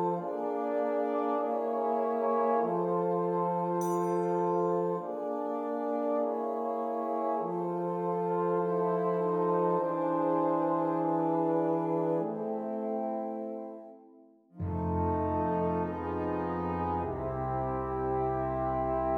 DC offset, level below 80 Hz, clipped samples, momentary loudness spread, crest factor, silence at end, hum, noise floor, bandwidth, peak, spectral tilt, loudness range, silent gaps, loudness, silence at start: under 0.1%; -54 dBFS; under 0.1%; 6 LU; 14 dB; 0 s; none; -58 dBFS; 17 kHz; -16 dBFS; -9 dB/octave; 4 LU; none; -31 LUFS; 0 s